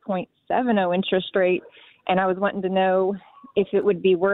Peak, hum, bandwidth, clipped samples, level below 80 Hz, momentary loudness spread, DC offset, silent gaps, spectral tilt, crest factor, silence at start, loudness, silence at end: -6 dBFS; none; 4.1 kHz; under 0.1%; -62 dBFS; 8 LU; under 0.1%; none; -10 dB/octave; 16 dB; 0.05 s; -23 LUFS; 0 s